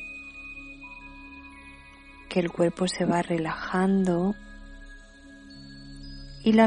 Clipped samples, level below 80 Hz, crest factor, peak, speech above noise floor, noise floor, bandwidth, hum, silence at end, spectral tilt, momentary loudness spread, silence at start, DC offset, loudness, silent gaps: under 0.1%; -50 dBFS; 22 dB; -6 dBFS; 23 dB; -49 dBFS; 10.5 kHz; none; 0 s; -6.5 dB/octave; 24 LU; 0 s; under 0.1%; -27 LUFS; none